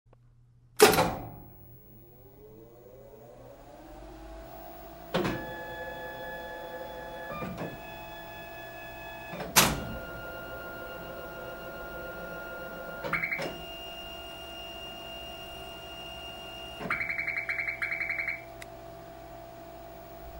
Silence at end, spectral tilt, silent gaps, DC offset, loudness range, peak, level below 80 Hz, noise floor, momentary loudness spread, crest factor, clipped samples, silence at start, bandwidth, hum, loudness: 0 s; -3 dB/octave; none; under 0.1%; 10 LU; -4 dBFS; -52 dBFS; -59 dBFS; 21 LU; 32 dB; under 0.1%; 0.1 s; 16.5 kHz; none; -32 LUFS